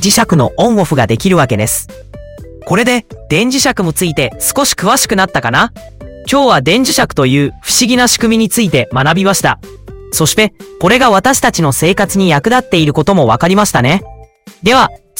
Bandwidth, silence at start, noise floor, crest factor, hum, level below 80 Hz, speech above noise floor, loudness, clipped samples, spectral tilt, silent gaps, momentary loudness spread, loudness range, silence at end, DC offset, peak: 17.5 kHz; 0 s; -30 dBFS; 12 dB; none; -36 dBFS; 19 dB; -10 LUFS; under 0.1%; -4 dB/octave; none; 6 LU; 3 LU; 0.25 s; under 0.1%; 0 dBFS